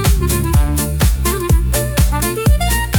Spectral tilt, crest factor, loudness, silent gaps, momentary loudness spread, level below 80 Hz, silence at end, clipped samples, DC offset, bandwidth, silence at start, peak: -5 dB/octave; 12 dB; -15 LUFS; none; 2 LU; -16 dBFS; 0 s; under 0.1%; under 0.1%; 19 kHz; 0 s; -2 dBFS